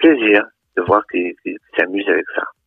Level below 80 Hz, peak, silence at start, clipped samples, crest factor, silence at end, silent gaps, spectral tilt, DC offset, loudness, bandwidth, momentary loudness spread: -56 dBFS; 0 dBFS; 0 s; under 0.1%; 16 dB; 0.15 s; none; -7.5 dB/octave; under 0.1%; -17 LUFS; 3.9 kHz; 11 LU